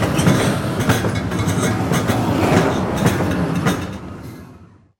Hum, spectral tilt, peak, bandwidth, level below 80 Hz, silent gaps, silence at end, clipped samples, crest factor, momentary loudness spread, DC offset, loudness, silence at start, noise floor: none; -5.5 dB/octave; 0 dBFS; 17 kHz; -38 dBFS; none; 0.35 s; under 0.1%; 18 dB; 15 LU; under 0.1%; -18 LUFS; 0 s; -44 dBFS